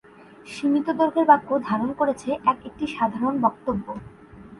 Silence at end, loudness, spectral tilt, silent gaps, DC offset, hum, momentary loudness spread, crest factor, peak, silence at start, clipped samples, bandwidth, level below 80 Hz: 0.05 s; -23 LUFS; -6.5 dB/octave; none; under 0.1%; none; 12 LU; 20 dB; -4 dBFS; 0.45 s; under 0.1%; 11.5 kHz; -56 dBFS